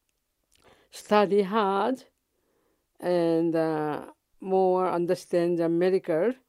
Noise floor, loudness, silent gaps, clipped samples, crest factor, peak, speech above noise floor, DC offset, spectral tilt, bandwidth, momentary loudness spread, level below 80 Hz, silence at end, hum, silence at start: -77 dBFS; -25 LUFS; none; under 0.1%; 18 dB; -8 dBFS; 52 dB; under 0.1%; -7 dB/octave; 13 kHz; 10 LU; -74 dBFS; 0.15 s; none; 0.95 s